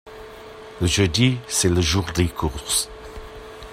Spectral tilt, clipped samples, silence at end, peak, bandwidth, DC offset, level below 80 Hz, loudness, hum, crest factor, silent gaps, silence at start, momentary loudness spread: -4 dB/octave; under 0.1%; 0 s; -6 dBFS; 16 kHz; under 0.1%; -38 dBFS; -21 LUFS; none; 18 dB; none; 0.05 s; 21 LU